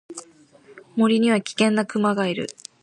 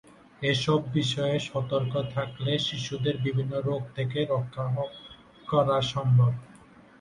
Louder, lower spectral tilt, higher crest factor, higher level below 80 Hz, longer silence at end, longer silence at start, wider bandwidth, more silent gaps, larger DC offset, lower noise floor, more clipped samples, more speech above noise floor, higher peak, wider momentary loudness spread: first, -21 LUFS vs -28 LUFS; about the same, -5 dB/octave vs -6 dB/octave; about the same, 18 dB vs 18 dB; second, -68 dBFS vs -58 dBFS; second, 0.3 s vs 0.45 s; second, 0.1 s vs 0.4 s; about the same, 11 kHz vs 10 kHz; neither; neither; about the same, -51 dBFS vs -53 dBFS; neither; first, 31 dB vs 26 dB; first, -6 dBFS vs -10 dBFS; first, 15 LU vs 8 LU